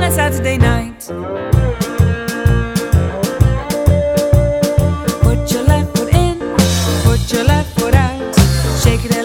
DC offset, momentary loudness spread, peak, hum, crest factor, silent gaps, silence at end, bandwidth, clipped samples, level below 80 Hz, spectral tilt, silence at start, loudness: under 0.1%; 3 LU; 0 dBFS; none; 14 dB; none; 0 s; 18 kHz; under 0.1%; -20 dBFS; -5.5 dB/octave; 0 s; -14 LUFS